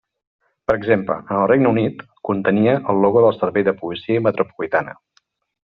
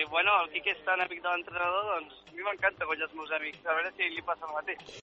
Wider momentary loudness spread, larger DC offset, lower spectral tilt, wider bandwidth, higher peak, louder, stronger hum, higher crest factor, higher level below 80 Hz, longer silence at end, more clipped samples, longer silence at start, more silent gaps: about the same, 9 LU vs 10 LU; neither; first, -6 dB/octave vs 1 dB/octave; second, 5 kHz vs 7.6 kHz; first, -2 dBFS vs -12 dBFS; first, -18 LUFS vs -31 LUFS; neither; about the same, 16 dB vs 20 dB; first, -56 dBFS vs -68 dBFS; first, 0.7 s vs 0 s; neither; first, 0.7 s vs 0 s; neither